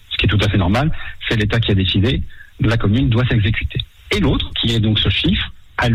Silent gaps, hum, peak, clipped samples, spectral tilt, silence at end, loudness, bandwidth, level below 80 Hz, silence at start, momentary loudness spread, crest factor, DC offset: none; none; -6 dBFS; under 0.1%; -6.5 dB/octave; 0 s; -17 LUFS; 11.5 kHz; -28 dBFS; 0.1 s; 8 LU; 10 dB; under 0.1%